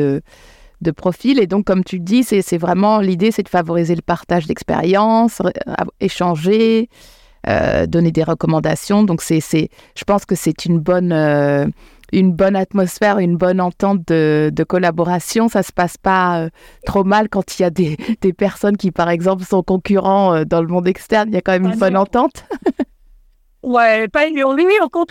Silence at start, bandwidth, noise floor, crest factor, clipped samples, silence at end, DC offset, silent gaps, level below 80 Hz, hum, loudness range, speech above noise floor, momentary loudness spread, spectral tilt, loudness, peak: 0 s; 16.5 kHz; -50 dBFS; 14 dB; under 0.1%; 0.05 s; under 0.1%; none; -44 dBFS; none; 1 LU; 35 dB; 7 LU; -6.5 dB/octave; -16 LUFS; -2 dBFS